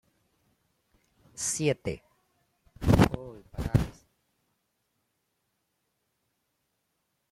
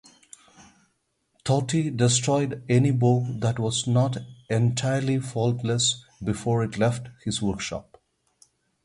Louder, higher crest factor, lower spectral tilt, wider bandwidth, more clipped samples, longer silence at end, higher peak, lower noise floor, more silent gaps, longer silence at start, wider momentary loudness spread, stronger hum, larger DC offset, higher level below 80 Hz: second, -28 LUFS vs -25 LUFS; first, 24 dB vs 18 dB; about the same, -5.5 dB/octave vs -5 dB/octave; first, 16 kHz vs 11.5 kHz; neither; first, 3.4 s vs 1.05 s; about the same, -8 dBFS vs -8 dBFS; first, -79 dBFS vs -72 dBFS; neither; about the same, 1.4 s vs 1.45 s; first, 19 LU vs 10 LU; neither; neither; first, -44 dBFS vs -54 dBFS